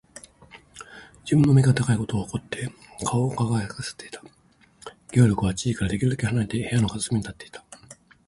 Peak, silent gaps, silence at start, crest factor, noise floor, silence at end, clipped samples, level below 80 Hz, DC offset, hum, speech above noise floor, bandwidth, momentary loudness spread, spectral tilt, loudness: -6 dBFS; none; 0.15 s; 18 dB; -51 dBFS; 0.35 s; under 0.1%; -48 dBFS; under 0.1%; none; 28 dB; 11.5 kHz; 24 LU; -6 dB/octave; -24 LUFS